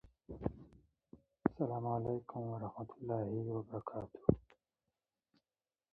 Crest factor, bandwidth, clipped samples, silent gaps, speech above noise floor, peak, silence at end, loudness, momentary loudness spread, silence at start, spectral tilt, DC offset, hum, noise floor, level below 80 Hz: 28 dB; 3.4 kHz; under 0.1%; none; over 51 dB; -14 dBFS; 1.5 s; -41 LUFS; 10 LU; 0.05 s; -11 dB/octave; under 0.1%; none; under -90 dBFS; -60 dBFS